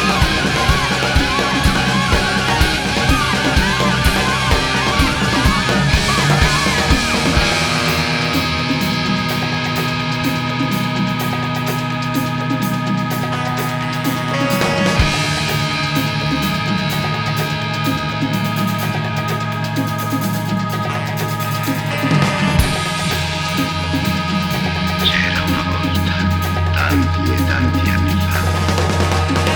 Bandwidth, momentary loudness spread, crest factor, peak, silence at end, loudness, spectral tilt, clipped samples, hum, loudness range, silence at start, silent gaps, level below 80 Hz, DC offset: over 20 kHz; 5 LU; 16 dB; 0 dBFS; 0 s; -16 LUFS; -4.5 dB/octave; under 0.1%; none; 5 LU; 0 s; none; -28 dBFS; under 0.1%